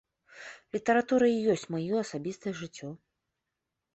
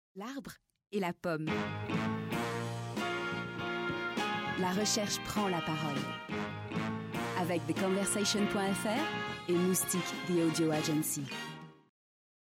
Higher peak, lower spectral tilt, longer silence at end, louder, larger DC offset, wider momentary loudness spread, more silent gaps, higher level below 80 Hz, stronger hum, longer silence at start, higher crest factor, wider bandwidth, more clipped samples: first, -12 dBFS vs -20 dBFS; first, -5.5 dB/octave vs -4 dB/octave; first, 1 s vs 0.85 s; first, -29 LUFS vs -34 LUFS; neither; first, 20 LU vs 8 LU; neither; second, -72 dBFS vs -66 dBFS; neither; first, 0.35 s vs 0.15 s; about the same, 18 dB vs 14 dB; second, 8.4 kHz vs 16 kHz; neither